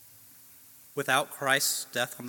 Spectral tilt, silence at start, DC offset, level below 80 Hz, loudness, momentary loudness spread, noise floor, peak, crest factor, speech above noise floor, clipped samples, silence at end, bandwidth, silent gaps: -1.5 dB/octave; 0.95 s; under 0.1%; -82 dBFS; -27 LUFS; 9 LU; -54 dBFS; -8 dBFS; 24 dB; 25 dB; under 0.1%; 0 s; 17.5 kHz; none